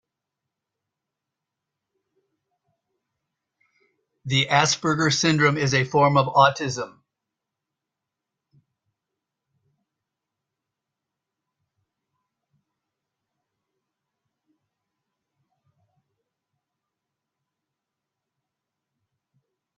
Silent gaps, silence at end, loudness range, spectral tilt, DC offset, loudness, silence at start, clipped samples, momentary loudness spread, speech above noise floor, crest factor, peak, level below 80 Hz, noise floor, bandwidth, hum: none; 12.9 s; 8 LU; -4 dB/octave; under 0.1%; -20 LUFS; 4.25 s; under 0.1%; 11 LU; 65 dB; 28 dB; -2 dBFS; -66 dBFS; -85 dBFS; 9.2 kHz; none